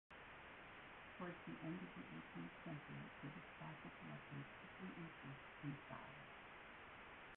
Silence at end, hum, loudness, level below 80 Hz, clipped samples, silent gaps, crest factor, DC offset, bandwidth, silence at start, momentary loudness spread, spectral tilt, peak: 0 s; none; -55 LUFS; -76 dBFS; under 0.1%; none; 18 dB; under 0.1%; 4 kHz; 0.1 s; 6 LU; -4.5 dB/octave; -38 dBFS